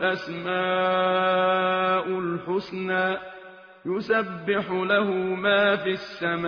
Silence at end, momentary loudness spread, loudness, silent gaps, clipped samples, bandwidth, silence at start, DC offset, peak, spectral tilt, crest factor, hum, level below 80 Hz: 0 s; 8 LU; -24 LUFS; none; under 0.1%; 6.6 kHz; 0 s; under 0.1%; -8 dBFS; -2.5 dB/octave; 16 dB; none; -66 dBFS